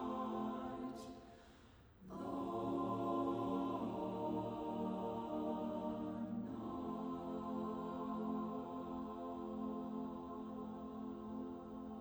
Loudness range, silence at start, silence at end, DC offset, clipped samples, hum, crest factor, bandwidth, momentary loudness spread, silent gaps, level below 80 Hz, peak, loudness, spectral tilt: 4 LU; 0 s; 0 s; under 0.1%; under 0.1%; none; 16 dB; over 20 kHz; 9 LU; none; -68 dBFS; -28 dBFS; -44 LUFS; -8 dB/octave